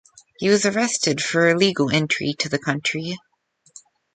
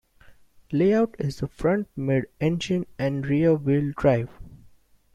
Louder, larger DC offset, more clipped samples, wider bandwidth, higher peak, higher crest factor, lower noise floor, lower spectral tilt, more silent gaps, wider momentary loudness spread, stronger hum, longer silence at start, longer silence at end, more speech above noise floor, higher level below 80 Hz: first, -20 LUFS vs -24 LUFS; neither; neither; second, 9.4 kHz vs 11 kHz; about the same, -4 dBFS vs -6 dBFS; about the same, 18 dB vs 18 dB; second, -51 dBFS vs -55 dBFS; second, -4 dB/octave vs -7.5 dB/octave; neither; about the same, 8 LU vs 7 LU; neither; about the same, 0.4 s vs 0.3 s; first, 0.95 s vs 0.6 s; about the same, 30 dB vs 32 dB; second, -62 dBFS vs -50 dBFS